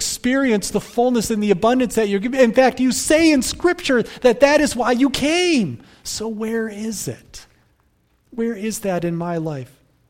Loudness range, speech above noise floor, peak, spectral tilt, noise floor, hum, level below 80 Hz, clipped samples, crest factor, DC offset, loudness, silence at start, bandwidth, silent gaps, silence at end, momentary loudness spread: 10 LU; 43 dB; 0 dBFS; -4 dB/octave; -61 dBFS; none; -46 dBFS; under 0.1%; 18 dB; under 0.1%; -18 LUFS; 0 s; 16.5 kHz; none; 0.45 s; 12 LU